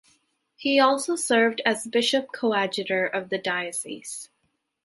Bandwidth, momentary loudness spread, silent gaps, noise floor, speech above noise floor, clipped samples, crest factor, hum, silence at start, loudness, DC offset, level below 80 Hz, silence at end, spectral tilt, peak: 12 kHz; 12 LU; none; -74 dBFS; 50 dB; under 0.1%; 20 dB; none; 0.6 s; -24 LUFS; under 0.1%; -76 dBFS; 0.6 s; -2.5 dB/octave; -4 dBFS